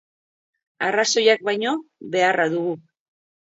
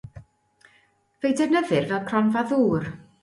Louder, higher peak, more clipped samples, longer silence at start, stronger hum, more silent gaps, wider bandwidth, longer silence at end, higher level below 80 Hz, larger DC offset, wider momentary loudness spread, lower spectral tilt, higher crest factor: about the same, -21 LUFS vs -23 LUFS; first, -4 dBFS vs -8 dBFS; neither; first, 0.8 s vs 0.05 s; neither; neither; second, 8 kHz vs 11.5 kHz; first, 0.65 s vs 0.2 s; second, -76 dBFS vs -58 dBFS; neither; first, 11 LU vs 7 LU; second, -2.5 dB/octave vs -6.5 dB/octave; about the same, 20 dB vs 16 dB